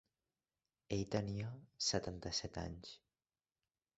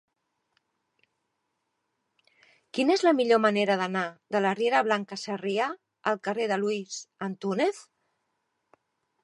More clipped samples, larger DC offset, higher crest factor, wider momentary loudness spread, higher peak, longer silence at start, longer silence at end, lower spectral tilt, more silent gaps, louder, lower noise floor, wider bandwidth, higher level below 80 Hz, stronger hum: neither; neither; about the same, 22 dB vs 20 dB; about the same, 14 LU vs 12 LU; second, -22 dBFS vs -8 dBFS; second, 0.9 s vs 2.75 s; second, 1 s vs 1.4 s; about the same, -4.5 dB/octave vs -4.5 dB/octave; neither; second, -42 LUFS vs -27 LUFS; first, under -90 dBFS vs -79 dBFS; second, 8 kHz vs 11.5 kHz; first, -62 dBFS vs -82 dBFS; neither